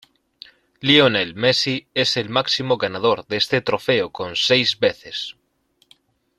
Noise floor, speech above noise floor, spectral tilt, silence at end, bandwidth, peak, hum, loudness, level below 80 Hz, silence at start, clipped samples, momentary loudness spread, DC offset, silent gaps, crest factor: -64 dBFS; 44 dB; -4 dB/octave; 1.05 s; 13 kHz; -2 dBFS; none; -19 LUFS; -60 dBFS; 0.8 s; under 0.1%; 10 LU; under 0.1%; none; 20 dB